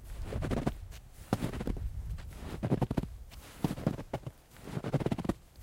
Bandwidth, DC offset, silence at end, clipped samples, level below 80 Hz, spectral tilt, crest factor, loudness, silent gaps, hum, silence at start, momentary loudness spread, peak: 16.5 kHz; under 0.1%; 0 s; under 0.1%; -44 dBFS; -7 dB/octave; 24 dB; -37 LUFS; none; none; 0 s; 16 LU; -12 dBFS